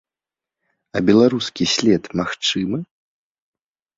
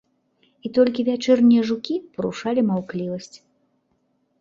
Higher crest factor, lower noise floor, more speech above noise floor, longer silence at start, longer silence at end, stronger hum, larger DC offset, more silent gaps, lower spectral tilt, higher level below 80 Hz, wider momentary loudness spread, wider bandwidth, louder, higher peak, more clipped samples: about the same, 20 dB vs 18 dB; first, -89 dBFS vs -68 dBFS; first, 71 dB vs 48 dB; first, 0.95 s vs 0.65 s; about the same, 1.15 s vs 1.05 s; neither; neither; neither; second, -4.5 dB/octave vs -6.5 dB/octave; first, -54 dBFS vs -64 dBFS; second, 11 LU vs 15 LU; about the same, 7.8 kHz vs 7.6 kHz; about the same, -19 LUFS vs -21 LUFS; about the same, -2 dBFS vs -4 dBFS; neither